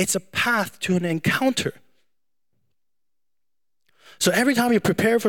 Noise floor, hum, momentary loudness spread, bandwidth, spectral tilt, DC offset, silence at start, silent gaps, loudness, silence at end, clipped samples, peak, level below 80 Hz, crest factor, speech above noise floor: -89 dBFS; none; 5 LU; 17.5 kHz; -4 dB/octave; 0.2%; 0 s; none; -21 LUFS; 0 s; under 0.1%; -6 dBFS; -62 dBFS; 18 dB; 68 dB